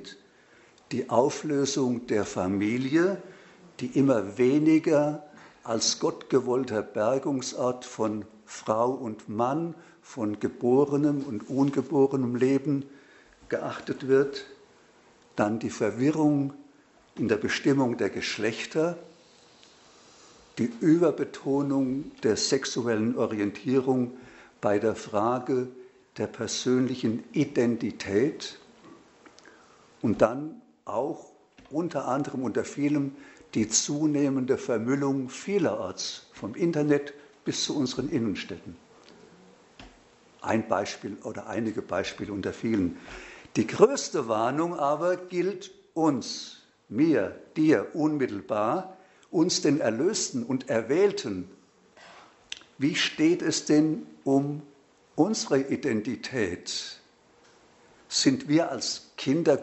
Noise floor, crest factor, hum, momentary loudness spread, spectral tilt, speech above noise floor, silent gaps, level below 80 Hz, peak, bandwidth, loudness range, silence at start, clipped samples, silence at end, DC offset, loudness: -59 dBFS; 22 dB; none; 13 LU; -5 dB/octave; 33 dB; none; -66 dBFS; -4 dBFS; 8.2 kHz; 5 LU; 0 s; under 0.1%; 0 s; under 0.1%; -27 LUFS